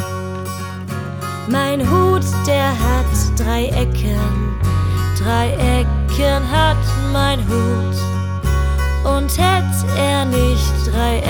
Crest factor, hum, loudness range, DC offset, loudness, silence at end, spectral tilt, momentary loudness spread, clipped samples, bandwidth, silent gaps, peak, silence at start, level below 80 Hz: 14 dB; none; 1 LU; under 0.1%; -17 LUFS; 0 s; -5.5 dB/octave; 9 LU; under 0.1%; 19.5 kHz; none; -2 dBFS; 0 s; -20 dBFS